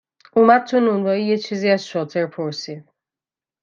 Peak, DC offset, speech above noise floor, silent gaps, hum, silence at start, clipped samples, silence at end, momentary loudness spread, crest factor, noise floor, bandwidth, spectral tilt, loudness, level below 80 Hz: -2 dBFS; under 0.1%; over 72 dB; none; none; 0.35 s; under 0.1%; 0.8 s; 14 LU; 18 dB; under -90 dBFS; 7.4 kHz; -6 dB/octave; -19 LUFS; -68 dBFS